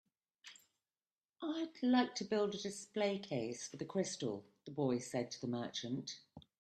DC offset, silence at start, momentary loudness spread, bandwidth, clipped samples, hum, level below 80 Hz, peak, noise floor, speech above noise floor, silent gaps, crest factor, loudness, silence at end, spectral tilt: under 0.1%; 0.45 s; 15 LU; 12.5 kHz; under 0.1%; none; -82 dBFS; -20 dBFS; under -90 dBFS; over 51 dB; 1.12-1.17 s, 1.25-1.29 s; 20 dB; -40 LUFS; 0.2 s; -4.5 dB/octave